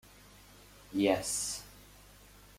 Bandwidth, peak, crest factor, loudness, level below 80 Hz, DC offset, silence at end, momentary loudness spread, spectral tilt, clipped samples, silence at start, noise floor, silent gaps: 16.5 kHz; -12 dBFS; 24 dB; -33 LUFS; -60 dBFS; under 0.1%; 0.6 s; 26 LU; -3 dB/octave; under 0.1%; 0.6 s; -57 dBFS; none